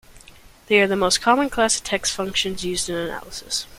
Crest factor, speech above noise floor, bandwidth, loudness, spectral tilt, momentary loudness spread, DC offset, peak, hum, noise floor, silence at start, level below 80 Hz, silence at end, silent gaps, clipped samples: 20 dB; 26 dB; 16.5 kHz; -20 LUFS; -2.5 dB/octave; 9 LU; under 0.1%; -2 dBFS; none; -47 dBFS; 0.1 s; -46 dBFS; 0 s; none; under 0.1%